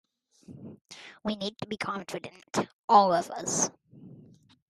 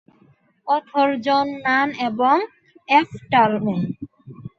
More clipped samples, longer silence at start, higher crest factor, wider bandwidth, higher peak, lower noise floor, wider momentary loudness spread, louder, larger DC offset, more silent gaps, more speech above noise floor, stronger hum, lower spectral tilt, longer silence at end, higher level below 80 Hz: neither; second, 0.5 s vs 0.65 s; about the same, 22 dB vs 18 dB; first, 13.5 kHz vs 7.6 kHz; second, -8 dBFS vs -2 dBFS; about the same, -55 dBFS vs -57 dBFS; first, 25 LU vs 16 LU; second, -28 LUFS vs -20 LUFS; neither; first, 0.81-0.85 s, 2.73-2.88 s vs none; second, 27 dB vs 38 dB; neither; second, -3 dB/octave vs -6.5 dB/octave; first, 0.55 s vs 0.1 s; second, -70 dBFS vs -62 dBFS